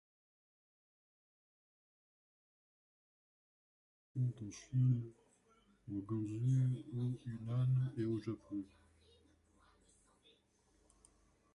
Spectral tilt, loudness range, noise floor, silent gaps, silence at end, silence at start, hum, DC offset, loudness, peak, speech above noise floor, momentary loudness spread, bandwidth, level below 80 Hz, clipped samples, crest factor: -8.5 dB/octave; 10 LU; -75 dBFS; none; 2.9 s; 4.15 s; none; under 0.1%; -39 LUFS; -24 dBFS; 37 dB; 13 LU; 9.6 kHz; -72 dBFS; under 0.1%; 18 dB